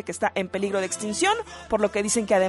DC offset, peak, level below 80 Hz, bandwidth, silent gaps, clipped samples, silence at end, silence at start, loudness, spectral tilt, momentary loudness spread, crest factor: under 0.1%; -10 dBFS; -54 dBFS; 11.5 kHz; none; under 0.1%; 0 s; 0.05 s; -25 LUFS; -3 dB/octave; 5 LU; 16 dB